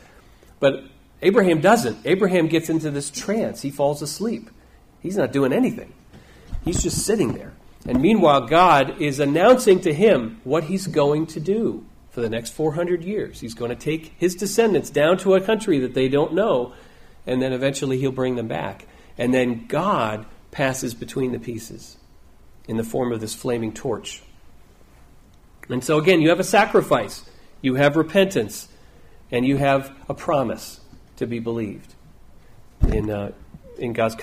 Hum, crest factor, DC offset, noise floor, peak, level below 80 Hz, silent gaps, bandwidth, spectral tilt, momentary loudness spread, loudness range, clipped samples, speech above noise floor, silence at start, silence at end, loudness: none; 18 dB; under 0.1%; -49 dBFS; -4 dBFS; -40 dBFS; none; 15.5 kHz; -5.5 dB/octave; 16 LU; 10 LU; under 0.1%; 29 dB; 0.6 s; 0 s; -21 LUFS